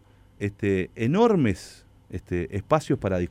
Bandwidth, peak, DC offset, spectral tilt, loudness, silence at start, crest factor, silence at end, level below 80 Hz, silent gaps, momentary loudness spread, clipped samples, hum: 14 kHz; -6 dBFS; under 0.1%; -7.5 dB/octave; -25 LUFS; 0.4 s; 18 dB; 0 s; -48 dBFS; none; 16 LU; under 0.1%; none